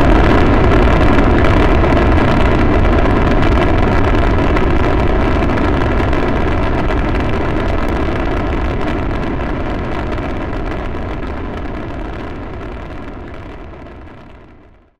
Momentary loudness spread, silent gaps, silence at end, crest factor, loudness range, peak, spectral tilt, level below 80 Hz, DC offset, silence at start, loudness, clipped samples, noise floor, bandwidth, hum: 16 LU; none; 0.6 s; 12 dB; 13 LU; -2 dBFS; -8 dB/octave; -18 dBFS; under 0.1%; 0 s; -15 LUFS; under 0.1%; -43 dBFS; 8.8 kHz; none